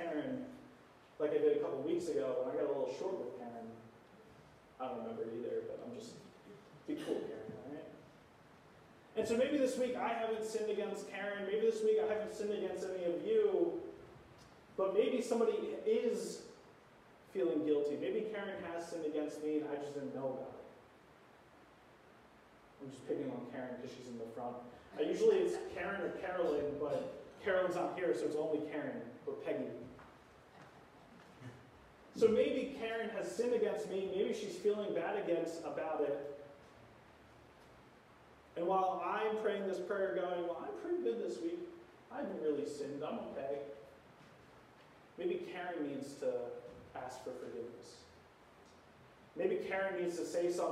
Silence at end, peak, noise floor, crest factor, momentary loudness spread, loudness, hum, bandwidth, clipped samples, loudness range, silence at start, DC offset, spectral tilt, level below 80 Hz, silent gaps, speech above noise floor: 0 s; -18 dBFS; -63 dBFS; 22 dB; 19 LU; -38 LUFS; none; 13.5 kHz; under 0.1%; 10 LU; 0 s; under 0.1%; -5.5 dB/octave; -74 dBFS; none; 25 dB